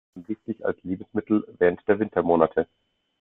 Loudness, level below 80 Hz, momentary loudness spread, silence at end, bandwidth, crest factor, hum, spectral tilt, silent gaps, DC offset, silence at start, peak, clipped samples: -25 LUFS; -62 dBFS; 13 LU; 0.55 s; 3.9 kHz; 22 dB; none; -11 dB/octave; none; under 0.1%; 0.15 s; -4 dBFS; under 0.1%